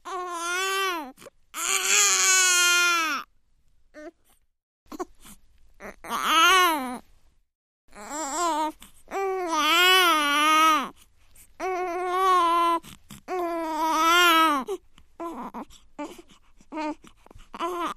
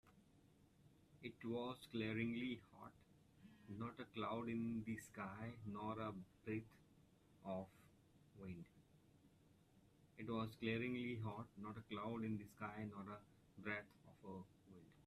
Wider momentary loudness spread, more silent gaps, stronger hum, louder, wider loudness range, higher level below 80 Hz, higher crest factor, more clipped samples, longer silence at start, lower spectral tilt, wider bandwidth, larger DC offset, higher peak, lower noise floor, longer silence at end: first, 22 LU vs 18 LU; first, 4.63-4.86 s, 7.55-7.88 s vs none; neither; first, -21 LUFS vs -49 LUFS; about the same, 7 LU vs 7 LU; first, -58 dBFS vs -78 dBFS; about the same, 20 dB vs 22 dB; neither; about the same, 0.05 s vs 0.05 s; second, 0.5 dB/octave vs -7 dB/octave; first, 15.5 kHz vs 13.5 kHz; neither; first, -6 dBFS vs -28 dBFS; second, -64 dBFS vs -73 dBFS; about the same, 0.05 s vs 0 s